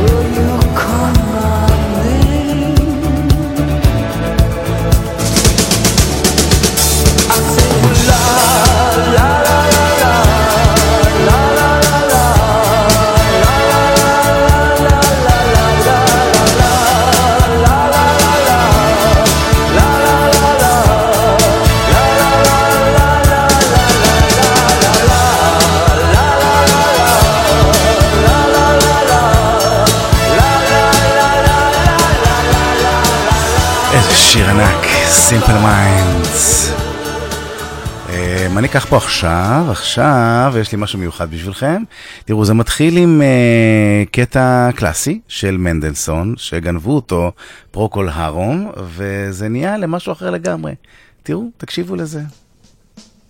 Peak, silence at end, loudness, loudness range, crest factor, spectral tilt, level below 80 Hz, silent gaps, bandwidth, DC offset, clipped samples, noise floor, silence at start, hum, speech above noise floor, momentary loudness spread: 0 dBFS; 1 s; -11 LUFS; 9 LU; 10 dB; -4 dB/octave; -20 dBFS; none; 17 kHz; under 0.1%; under 0.1%; -49 dBFS; 0 s; none; 35 dB; 11 LU